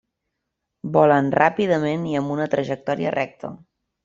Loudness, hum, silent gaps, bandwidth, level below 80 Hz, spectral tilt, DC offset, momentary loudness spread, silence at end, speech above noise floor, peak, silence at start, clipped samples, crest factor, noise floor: -21 LUFS; none; none; 7.6 kHz; -62 dBFS; -7.5 dB/octave; under 0.1%; 13 LU; 0.5 s; 59 dB; -2 dBFS; 0.85 s; under 0.1%; 20 dB; -79 dBFS